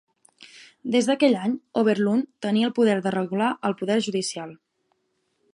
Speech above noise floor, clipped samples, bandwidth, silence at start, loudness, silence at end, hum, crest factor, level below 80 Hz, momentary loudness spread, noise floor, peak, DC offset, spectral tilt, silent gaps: 50 dB; under 0.1%; 11.5 kHz; 0.55 s; -23 LUFS; 1 s; none; 18 dB; -74 dBFS; 8 LU; -73 dBFS; -6 dBFS; under 0.1%; -5 dB/octave; none